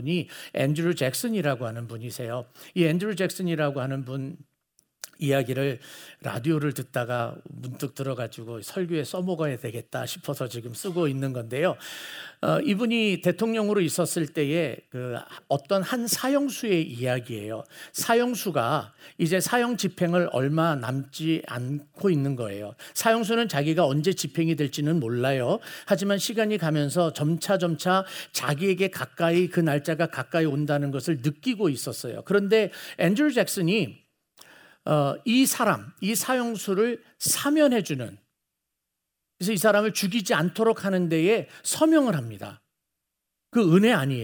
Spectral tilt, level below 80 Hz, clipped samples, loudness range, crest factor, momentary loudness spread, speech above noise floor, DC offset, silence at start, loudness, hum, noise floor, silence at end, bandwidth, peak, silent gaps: -5 dB/octave; -74 dBFS; under 0.1%; 5 LU; 20 dB; 12 LU; 57 dB; under 0.1%; 0 s; -25 LUFS; none; -83 dBFS; 0 s; over 20 kHz; -6 dBFS; none